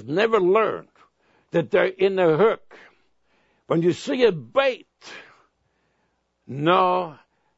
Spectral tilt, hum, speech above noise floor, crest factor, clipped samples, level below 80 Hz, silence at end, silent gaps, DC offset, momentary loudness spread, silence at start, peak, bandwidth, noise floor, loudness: -6.5 dB/octave; none; 50 dB; 20 dB; under 0.1%; -66 dBFS; 0.45 s; none; under 0.1%; 18 LU; 0 s; -4 dBFS; 8 kHz; -71 dBFS; -21 LUFS